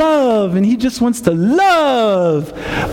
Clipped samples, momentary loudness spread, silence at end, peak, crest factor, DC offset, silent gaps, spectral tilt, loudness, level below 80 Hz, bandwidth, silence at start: under 0.1%; 7 LU; 0 s; 0 dBFS; 14 dB; under 0.1%; none; -6 dB/octave; -14 LUFS; -40 dBFS; 16.5 kHz; 0 s